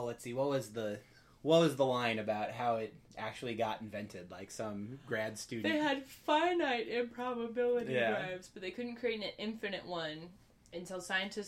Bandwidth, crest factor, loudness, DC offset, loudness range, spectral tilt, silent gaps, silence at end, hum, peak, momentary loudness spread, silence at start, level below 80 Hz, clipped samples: 16 kHz; 20 dB; -36 LUFS; under 0.1%; 5 LU; -5 dB/octave; none; 0 s; none; -16 dBFS; 14 LU; 0 s; -70 dBFS; under 0.1%